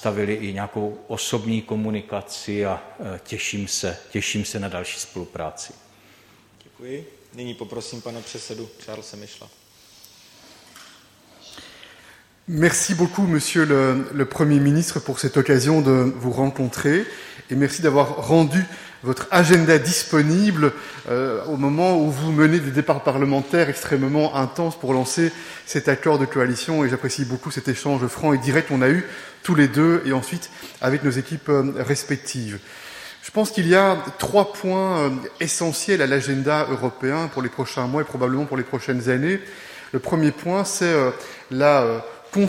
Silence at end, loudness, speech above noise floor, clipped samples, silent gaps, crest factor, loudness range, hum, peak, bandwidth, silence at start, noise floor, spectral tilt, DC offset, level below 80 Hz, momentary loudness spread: 0 s; -21 LUFS; 32 dB; under 0.1%; none; 20 dB; 17 LU; none; 0 dBFS; 16.5 kHz; 0 s; -53 dBFS; -5 dB/octave; under 0.1%; -56 dBFS; 17 LU